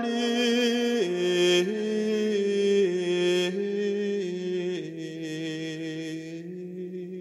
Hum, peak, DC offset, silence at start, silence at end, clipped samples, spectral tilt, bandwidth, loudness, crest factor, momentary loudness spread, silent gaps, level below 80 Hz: none; -12 dBFS; under 0.1%; 0 s; 0 s; under 0.1%; -4.5 dB/octave; 13.5 kHz; -27 LUFS; 16 dB; 13 LU; none; -80 dBFS